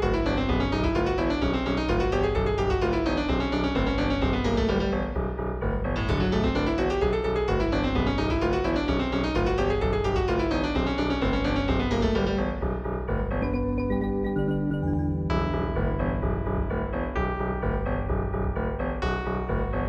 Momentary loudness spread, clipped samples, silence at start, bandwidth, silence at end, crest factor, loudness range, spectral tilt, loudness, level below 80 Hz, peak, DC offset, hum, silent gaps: 4 LU; under 0.1%; 0 s; 8 kHz; 0 s; 14 dB; 3 LU; -7.5 dB/octave; -26 LUFS; -32 dBFS; -12 dBFS; under 0.1%; none; none